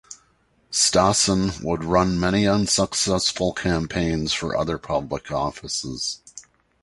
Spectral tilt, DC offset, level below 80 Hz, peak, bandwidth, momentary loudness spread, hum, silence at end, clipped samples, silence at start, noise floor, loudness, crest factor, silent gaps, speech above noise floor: -3.5 dB/octave; under 0.1%; -42 dBFS; -4 dBFS; 11.5 kHz; 10 LU; none; 0.4 s; under 0.1%; 0.1 s; -62 dBFS; -22 LUFS; 20 dB; none; 40 dB